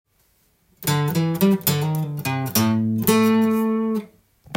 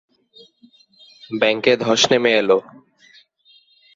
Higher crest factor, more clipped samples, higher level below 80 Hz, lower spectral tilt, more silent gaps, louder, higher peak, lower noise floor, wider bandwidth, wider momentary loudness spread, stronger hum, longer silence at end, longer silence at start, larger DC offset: about the same, 20 dB vs 18 dB; neither; first, -58 dBFS vs -66 dBFS; first, -5.5 dB/octave vs -3 dB/octave; neither; second, -20 LUFS vs -16 LUFS; about the same, -2 dBFS vs -2 dBFS; first, -63 dBFS vs -55 dBFS; first, 17 kHz vs 7.8 kHz; first, 8 LU vs 5 LU; neither; second, 0 s vs 1.35 s; second, 0.8 s vs 1.3 s; neither